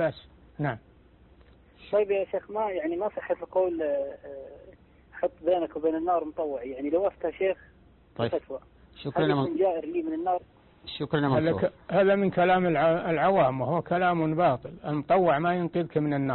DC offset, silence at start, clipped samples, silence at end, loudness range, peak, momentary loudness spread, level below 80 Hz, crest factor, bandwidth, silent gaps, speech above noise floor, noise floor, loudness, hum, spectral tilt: under 0.1%; 0 s; under 0.1%; 0 s; 6 LU; -12 dBFS; 11 LU; -58 dBFS; 14 dB; 4.3 kHz; none; 30 dB; -56 dBFS; -27 LUFS; none; -11 dB/octave